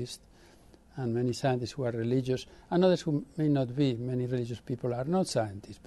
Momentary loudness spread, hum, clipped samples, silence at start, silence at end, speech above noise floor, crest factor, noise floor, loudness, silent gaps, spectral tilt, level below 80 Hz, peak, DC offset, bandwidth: 10 LU; none; under 0.1%; 0 s; 0.1 s; 27 dB; 16 dB; -57 dBFS; -31 LUFS; none; -7 dB/octave; -60 dBFS; -14 dBFS; under 0.1%; 12 kHz